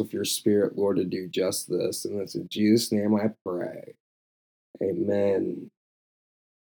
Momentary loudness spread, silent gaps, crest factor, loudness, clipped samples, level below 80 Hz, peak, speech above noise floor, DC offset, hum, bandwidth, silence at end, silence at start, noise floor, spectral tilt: 10 LU; 3.41-3.45 s, 4.00-4.74 s; 18 dB; -26 LUFS; under 0.1%; -78 dBFS; -8 dBFS; over 64 dB; under 0.1%; none; 20 kHz; 1 s; 0 s; under -90 dBFS; -5 dB/octave